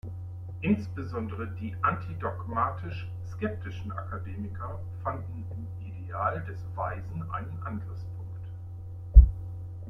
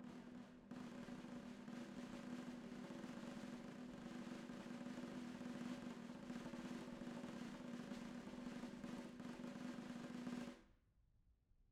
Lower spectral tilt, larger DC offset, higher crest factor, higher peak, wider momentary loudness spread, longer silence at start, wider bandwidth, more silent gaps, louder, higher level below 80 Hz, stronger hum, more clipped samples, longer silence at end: first, -9.5 dB/octave vs -5.5 dB/octave; neither; first, 26 dB vs 16 dB; first, -4 dBFS vs -38 dBFS; first, 12 LU vs 4 LU; about the same, 0.05 s vs 0 s; second, 5.2 kHz vs 14 kHz; neither; first, -31 LUFS vs -53 LUFS; first, -30 dBFS vs -76 dBFS; neither; neither; about the same, 0 s vs 0.05 s